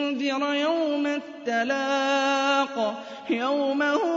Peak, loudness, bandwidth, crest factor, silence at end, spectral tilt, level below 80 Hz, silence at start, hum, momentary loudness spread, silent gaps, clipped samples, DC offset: -12 dBFS; -25 LUFS; 7.8 kHz; 14 dB; 0 s; -3 dB/octave; -80 dBFS; 0 s; none; 6 LU; none; under 0.1%; under 0.1%